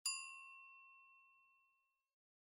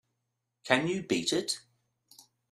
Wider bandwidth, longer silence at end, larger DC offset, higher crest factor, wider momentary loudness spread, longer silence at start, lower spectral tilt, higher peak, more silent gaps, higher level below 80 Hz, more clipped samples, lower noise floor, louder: second, 10 kHz vs 15 kHz; about the same, 0.9 s vs 0.95 s; neither; about the same, 26 dB vs 28 dB; first, 21 LU vs 9 LU; second, 0.05 s vs 0.65 s; second, 7.5 dB/octave vs -3.5 dB/octave; second, -30 dBFS vs -6 dBFS; neither; second, under -90 dBFS vs -72 dBFS; neither; about the same, -84 dBFS vs -83 dBFS; second, -50 LUFS vs -30 LUFS